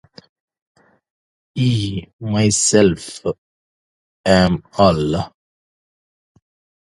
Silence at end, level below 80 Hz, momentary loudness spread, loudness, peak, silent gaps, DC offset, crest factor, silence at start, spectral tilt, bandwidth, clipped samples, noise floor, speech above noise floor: 1.55 s; -42 dBFS; 14 LU; -17 LUFS; 0 dBFS; 2.13-2.19 s, 3.38-4.24 s; under 0.1%; 20 dB; 1.55 s; -4.5 dB/octave; 11.5 kHz; under 0.1%; under -90 dBFS; over 74 dB